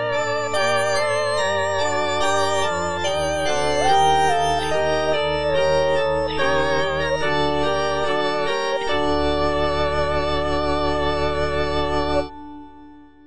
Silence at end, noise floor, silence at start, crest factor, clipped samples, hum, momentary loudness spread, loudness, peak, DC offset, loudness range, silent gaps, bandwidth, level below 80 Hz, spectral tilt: 0 s; -45 dBFS; 0 s; 14 dB; under 0.1%; none; 4 LU; -21 LUFS; -6 dBFS; 3%; 2 LU; none; 10 kHz; -38 dBFS; -4 dB/octave